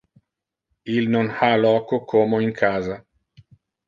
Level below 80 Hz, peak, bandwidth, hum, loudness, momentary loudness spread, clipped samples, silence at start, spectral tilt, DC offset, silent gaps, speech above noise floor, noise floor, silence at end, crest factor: -58 dBFS; -4 dBFS; 7.2 kHz; none; -20 LUFS; 11 LU; under 0.1%; 0.85 s; -7.5 dB/octave; under 0.1%; none; 63 dB; -83 dBFS; 0.9 s; 18 dB